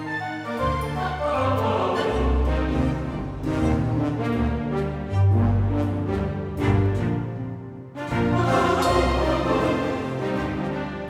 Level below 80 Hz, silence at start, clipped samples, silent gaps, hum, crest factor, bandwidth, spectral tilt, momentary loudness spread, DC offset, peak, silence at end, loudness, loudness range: -32 dBFS; 0 s; under 0.1%; none; none; 14 dB; 13.5 kHz; -7.5 dB/octave; 8 LU; under 0.1%; -8 dBFS; 0 s; -24 LUFS; 1 LU